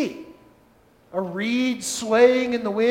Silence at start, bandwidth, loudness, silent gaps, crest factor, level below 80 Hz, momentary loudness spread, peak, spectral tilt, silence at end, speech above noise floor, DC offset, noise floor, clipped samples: 0 s; 16 kHz; -22 LUFS; none; 20 dB; -64 dBFS; 13 LU; -2 dBFS; -4 dB/octave; 0 s; 36 dB; under 0.1%; -56 dBFS; under 0.1%